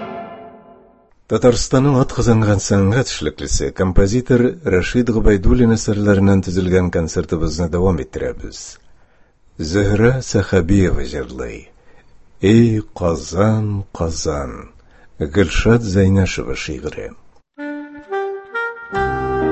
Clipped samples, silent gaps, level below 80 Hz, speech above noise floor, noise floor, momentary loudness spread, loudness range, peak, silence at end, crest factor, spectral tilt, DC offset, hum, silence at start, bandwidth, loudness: under 0.1%; none; -28 dBFS; 35 dB; -51 dBFS; 15 LU; 4 LU; 0 dBFS; 0 s; 16 dB; -6 dB/octave; under 0.1%; none; 0 s; 8.4 kHz; -17 LUFS